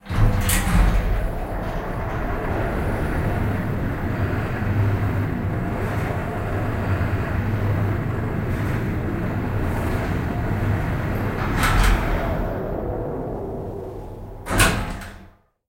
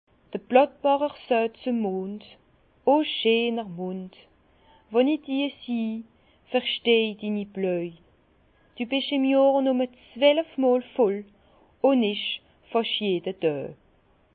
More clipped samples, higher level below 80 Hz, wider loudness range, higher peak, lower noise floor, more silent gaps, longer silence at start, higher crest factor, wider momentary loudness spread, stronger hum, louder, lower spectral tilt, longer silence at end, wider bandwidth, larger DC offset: neither; first, -28 dBFS vs -68 dBFS; about the same, 2 LU vs 4 LU; about the same, -2 dBFS vs -4 dBFS; second, -49 dBFS vs -62 dBFS; neither; second, 0.05 s vs 0.35 s; about the same, 20 dB vs 22 dB; second, 9 LU vs 13 LU; neither; about the same, -24 LUFS vs -25 LUFS; second, -5.5 dB/octave vs -9.5 dB/octave; second, 0.4 s vs 0.6 s; first, 16 kHz vs 4.7 kHz; neither